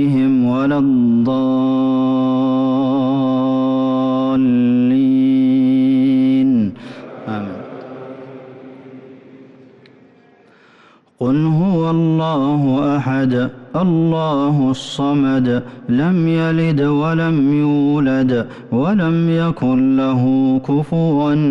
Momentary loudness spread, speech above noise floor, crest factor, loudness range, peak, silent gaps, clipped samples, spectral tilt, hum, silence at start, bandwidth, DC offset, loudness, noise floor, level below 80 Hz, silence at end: 9 LU; 35 dB; 8 dB; 8 LU; -8 dBFS; none; under 0.1%; -8.5 dB/octave; none; 0 s; 7.8 kHz; under 0.1%; -16 LUFS; -49 dBFS; -52 dBFS; 0 s